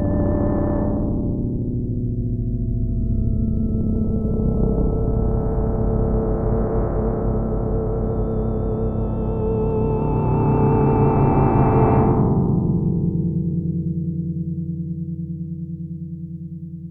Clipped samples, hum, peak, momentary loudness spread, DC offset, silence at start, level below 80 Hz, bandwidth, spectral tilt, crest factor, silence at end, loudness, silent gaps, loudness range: under 0.1%; none; -4 dBFS; 11 LU; under 0.1%; 0 s; -26 dBFS; 2.8 kHz; -13.5 dB/octave; 16 dB; 0 s; -21 LUFS; none; 6 LU